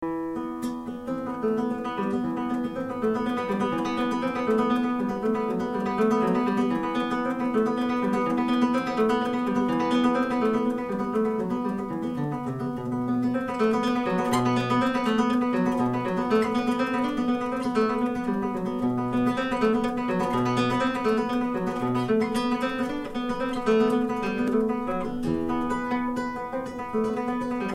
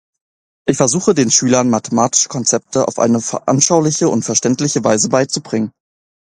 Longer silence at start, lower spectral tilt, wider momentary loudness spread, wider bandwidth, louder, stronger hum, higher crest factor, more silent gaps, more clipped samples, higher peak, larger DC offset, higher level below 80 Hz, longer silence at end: second, 0 s vs 0.65 s; first, -6.5 dB/octave vs -4 dB/octave; about the same, 6 LU vs 7 LU; first, 13 kHz vs 11.5 kHz; second, -26 LUFS vs -14 LUFS; neither; about the same, 16 dB vs 16 dB; neither; neither; second, -10 dBFS vs 0 dBFS; neither; about the same, -52 dBFS vs -54 dBFS; second, 0 s vs 0.55 s